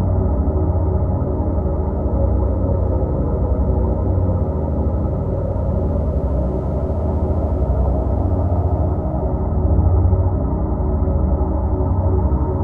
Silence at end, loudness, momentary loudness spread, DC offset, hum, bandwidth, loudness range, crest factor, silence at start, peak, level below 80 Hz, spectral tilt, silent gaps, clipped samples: 0 s; -19 LUFS; 3 LU; under 0.1%; none; 2.2 kHz; 2 LU; 14 dB; 0 s; -4 dBFS; -20 dBFS; -13 dB/octave; none; under 0.1%